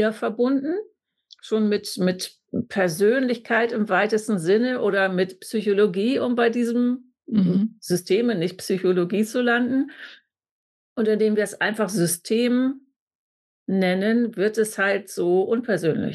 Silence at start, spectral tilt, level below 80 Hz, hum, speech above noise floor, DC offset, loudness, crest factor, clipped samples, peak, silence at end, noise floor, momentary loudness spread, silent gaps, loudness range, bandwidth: 0 s; -5.5 dB/octave; -72 dBFS; none; 33 dB; under 0.1%; -22 LUFS; 14 dB; under 0.1%; -10 dBFS; 0 s; -55 dBFS; 7 LU; 10.51-10.96 s, 12.96-13.66 s; 2 LU; 12.5 kHz